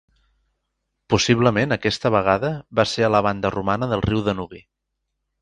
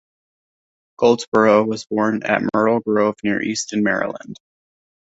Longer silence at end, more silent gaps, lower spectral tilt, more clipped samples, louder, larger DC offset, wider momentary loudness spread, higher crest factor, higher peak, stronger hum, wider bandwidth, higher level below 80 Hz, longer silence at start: about the same, 0.8 s vs 0.75 s; second, none vs 1.27-1.32 s; about the same, -5.5 dB/octave vs -5 dB/octave; neither; about the same, -20 LUFS vs -18 LUFS; neither; about the same, 6 LU vs 7 LU; about the same, 20 dB vs 18 dB; about the same, -2 dBFS vs -2 dBFS; neither; first, 10.5 kHz vs 8 kHz; first, -46 dBFS vs -58 dBFS; about the same, 1.1 s vs 1 s